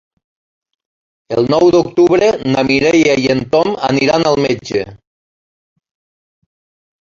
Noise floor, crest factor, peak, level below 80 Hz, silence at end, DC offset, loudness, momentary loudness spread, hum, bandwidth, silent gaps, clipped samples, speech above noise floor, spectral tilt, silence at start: under -90 dBFS; 14 dB; -2 dBFS; -48 dBFS; 2.05 s; under 0.1%; -13 LUFS; 8 LU; none; 7.4 kHz; none; under 0.1%; over 78 dB; -5.5 dB/octave; 1.3 s